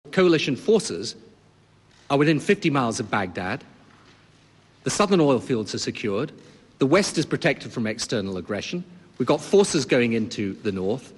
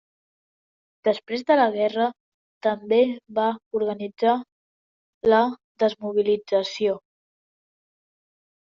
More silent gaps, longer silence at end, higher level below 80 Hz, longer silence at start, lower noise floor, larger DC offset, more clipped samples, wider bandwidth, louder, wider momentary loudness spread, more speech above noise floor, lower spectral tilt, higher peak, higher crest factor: second, none vs 2.20-2.61 s, 3.66-3.71 s, 4.52-5.21 s, 5.64-5.75 s; second, 0.1 s vs 1.7 s; first, -56 dBFS vs -68 dBFS; second, 0.05 s vs 1.05 s; second, -56 dBFS vs under -90 dBFS; neither; neither; first, 12 kHz vs 7.4 kHz; about the same, -23 LUFS vs -23 LUFS; first, 11 LU vs 7 LU; second, 34 dB vs over 68 dB; first, -5 dB/octave vs -3 dB/octave; about the same, -8 dBFS vs -6 dBFS; about the same, 16 dB vs 20 dB